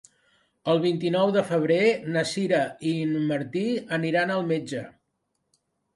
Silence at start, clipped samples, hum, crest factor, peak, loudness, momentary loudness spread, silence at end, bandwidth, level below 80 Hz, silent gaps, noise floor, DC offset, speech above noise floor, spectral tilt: 0.65 s; under 0.1%; none; 16 dB; -10 dBFS; -25 LUFS; 6 LU; 1.05 s; 11.5 kHz; -70 dBFS; none; -77 dBFS; under 0.1%; 52 dB; -6 dB/octave